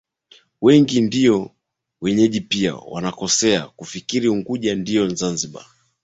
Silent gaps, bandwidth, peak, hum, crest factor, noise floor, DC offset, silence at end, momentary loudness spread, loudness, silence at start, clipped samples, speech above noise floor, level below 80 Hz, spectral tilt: none; 8.2 kHz; -2 dBFS; none; 18 dB; -53 dBFS; under 0.1%; 0.45 s; 12 LU; -19 LUFS; 0.6 s; under 0.1%; 35 dB; -56 dBFS; -4.5 dB/octave